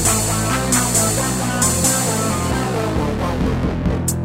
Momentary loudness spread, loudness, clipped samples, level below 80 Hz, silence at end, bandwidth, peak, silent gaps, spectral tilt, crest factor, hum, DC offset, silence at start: 5 LU; -17 LUFS; under 0.1%; -30 dBFS; 0 s; 16.5 kHz; -4 dBFS; none; -4 dB/octave; 14 dB; none; under 0.1%; 0 s